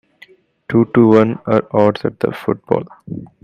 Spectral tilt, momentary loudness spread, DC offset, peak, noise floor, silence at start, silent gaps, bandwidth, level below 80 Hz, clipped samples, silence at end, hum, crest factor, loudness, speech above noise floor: -9 dB/octave; 15 LU; under 0.1%; 0 dBFS; -47 dBFS; 0.7 s; none; 6.8 kHz; -54 dBFS; under 0.1%; 0.2 s; none; 16 dB; -15 LUFS; 32 dB